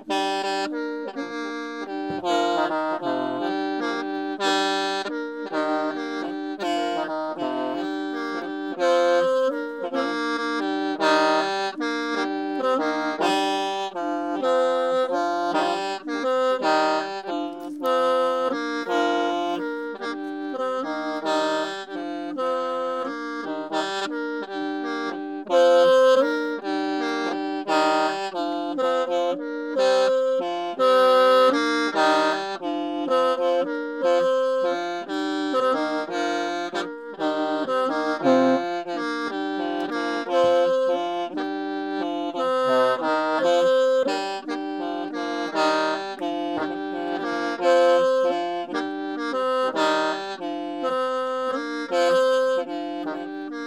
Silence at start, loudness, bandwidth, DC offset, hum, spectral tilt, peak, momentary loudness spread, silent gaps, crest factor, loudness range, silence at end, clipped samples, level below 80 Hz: 0 s; -24 LUFS; 12 kHz; under 0.1%; none; -3.5 dB/octave; -6 dBFS; 10 LU; none; 18 dB; 6 LU; 0 s; under 0.1%; -76 dBFS